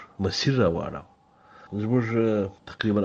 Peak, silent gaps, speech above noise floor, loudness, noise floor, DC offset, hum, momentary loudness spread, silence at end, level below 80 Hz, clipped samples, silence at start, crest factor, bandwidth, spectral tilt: -8 dBFS; none; 30 dB; -26 LUFS; -54 dBFS; under 0.1%; none; 13 LU; 0 s; -54 dBFS; under 0.1%; 0 s; 18 dB; 7.6 kHz; -6.5 dB/octave